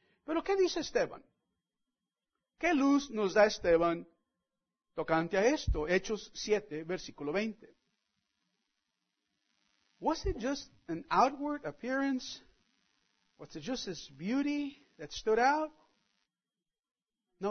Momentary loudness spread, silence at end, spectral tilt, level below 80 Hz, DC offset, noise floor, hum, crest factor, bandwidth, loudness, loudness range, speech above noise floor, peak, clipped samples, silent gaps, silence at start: 14 LU; 0 s; -3.5 dB/octave; -52 dBFS; under 0.1%; under -90 dBFS; none; 22 dB; 6.4 kHz; -33 LUFS; 10 LU; over 58 dB; -14 dBFS; under 0.1%; 16.79-16.83 s, 16.91-16.95 s; 0.3 s